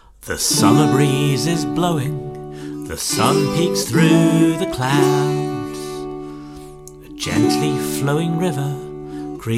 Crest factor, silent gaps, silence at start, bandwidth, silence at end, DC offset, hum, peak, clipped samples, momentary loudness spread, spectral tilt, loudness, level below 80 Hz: 18 dB; none; 0.2 s; 16.5 kHz; 0 s; under 0.1%; none; -2 dBFS; under 0.1%; 17 LU; -5 dB/octave; -18 LUFS; -46 dBFS